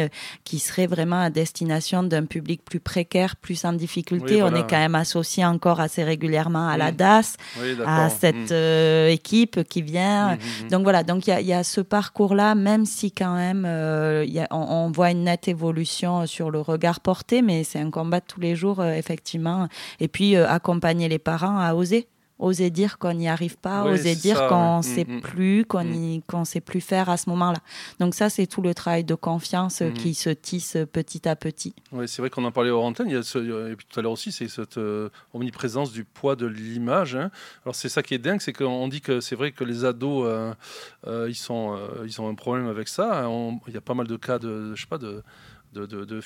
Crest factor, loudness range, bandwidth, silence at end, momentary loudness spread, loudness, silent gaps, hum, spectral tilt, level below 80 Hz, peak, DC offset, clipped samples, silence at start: 22 dB; 8 LU; 16 kHz; 0 s; 12 LU; -23 LUFS; none; none; -5.5 dB/octave; -60 dBFS; -2 dBFS; under 0.1%; under 0.1%; 0 s